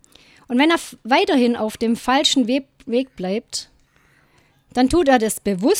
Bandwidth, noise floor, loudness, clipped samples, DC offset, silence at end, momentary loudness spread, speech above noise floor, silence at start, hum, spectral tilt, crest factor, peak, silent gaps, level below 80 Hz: 16.5 kHz; -57 dBFS; -19 LUFS; under 0.1%; under 0.1%; 0 s; 10 LU; 39 dB; 0.5 s; none; -3.5 dB/octave; 18 dB; -2 dBFS; none; -48 dBFS